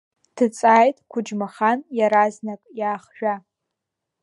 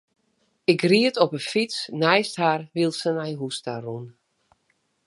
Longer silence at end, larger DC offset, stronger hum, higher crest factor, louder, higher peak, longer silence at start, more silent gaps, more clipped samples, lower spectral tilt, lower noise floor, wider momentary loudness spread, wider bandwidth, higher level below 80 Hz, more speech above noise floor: about the same, 0.85 s vs 0.95 s; neither; neither; about the same, 18 dB vs 22 dB; about the same, -21 LUFS vs -23 LUFS; about the same, -4 dBFS vs -2 dBFS; second, 0.35 s vs 0.7 s; neither; neither; about the same, -5.5 dB/octave vs -5 dB/octave; first, -82 dBFS vs -70 dBFS; about the same, 14 LU vs 13 LU; about the same, 11.5 kHz vs 11.5 kHz; about the same, -78 dBFS vs -74 dBFS; first, 62 dB vs 47 dB